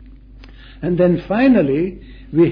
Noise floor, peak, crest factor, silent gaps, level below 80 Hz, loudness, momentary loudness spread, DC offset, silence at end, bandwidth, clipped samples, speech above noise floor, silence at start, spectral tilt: -40 dBFS; -4 dBFS; 14 dB; none; -40 dBFS; -17 LUFS; 11 LU; under 0.1%; 0 s; 5.2 kHz; under 0.1%; 24 dB; 0.05 s; -10.5 dB/octave